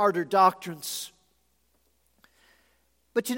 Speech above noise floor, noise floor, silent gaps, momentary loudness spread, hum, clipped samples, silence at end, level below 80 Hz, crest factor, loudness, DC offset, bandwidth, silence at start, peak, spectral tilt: 46 dB; -70 dBFS; none; 14 LU; none; under 0.1%; 0 s; -76 dBFS; 22 dB; -26 LUFS; under 0.1%; 17 kHz; 0 s; -8 dBFS; -4 dB/octave